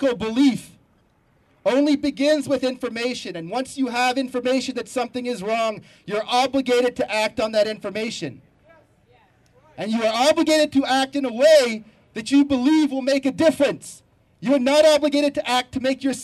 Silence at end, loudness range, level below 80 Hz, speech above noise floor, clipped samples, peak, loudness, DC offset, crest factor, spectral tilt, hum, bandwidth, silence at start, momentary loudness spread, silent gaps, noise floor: 0 s; 5 LU; -58 dBFS; 40 dB; under 0.1%; -4 dBFS; -20 LUFS; under 0.1%; 16 dB; -4 dB/octave; none; 13.5 kHz; 0 s; 12 LU; none; -61 dBFS